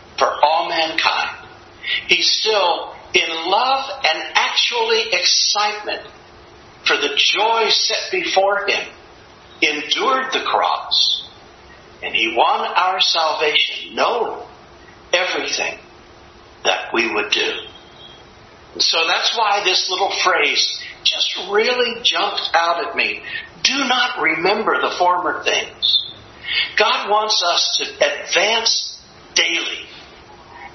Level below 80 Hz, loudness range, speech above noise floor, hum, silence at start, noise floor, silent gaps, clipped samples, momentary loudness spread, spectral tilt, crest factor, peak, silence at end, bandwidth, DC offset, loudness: -58 dBFS; 4 LU; 26 dB; none; 0 s; -43 dBFS; none; under 0.1%; 8 LU; -0.5 dB/octave; 20 dB; 0 dBFS; 0 s; 6.4 kHz; under 0.1%; -17 LUFS